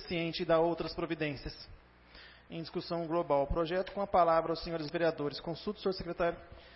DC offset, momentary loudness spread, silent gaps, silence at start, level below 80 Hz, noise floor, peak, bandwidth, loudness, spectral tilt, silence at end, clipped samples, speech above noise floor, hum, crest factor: under 0.1%; 17 LU; none; 0 s; -52 dBFS; -56 dBFS; -14 dBFS; 6 kHz; -33 LUFS; -9 dB/octave; 0 s; under 0.1%; 23 dB; 60 Hz at -65 dBFS; 20 dB